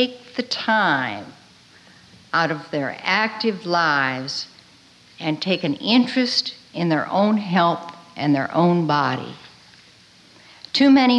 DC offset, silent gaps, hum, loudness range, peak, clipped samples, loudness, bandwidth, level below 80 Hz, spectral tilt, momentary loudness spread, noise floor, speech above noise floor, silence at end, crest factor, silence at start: under 0.1%; none; none; 3 LU; -6 dBFS; under 0.1%; -20 LUFS; 9.6 kHz; -68 dBFS; -5.5 dB/octave; 11 LU; -51 dBFS; 31 dB; 0 s; 16 dB; 0 s